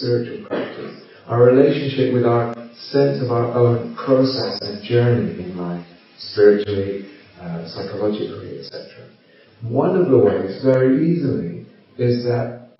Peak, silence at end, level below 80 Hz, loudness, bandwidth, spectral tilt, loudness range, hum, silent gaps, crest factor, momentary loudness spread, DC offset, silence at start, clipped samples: 0 dBFS; 0.15 s; -60 dBFS; -18 LUFS; 5.8 kHz; -6.5 dB/octave; 4 LU; none; none; 18 dB; 18 LU; under 0.1%; 0 s; under 0.1%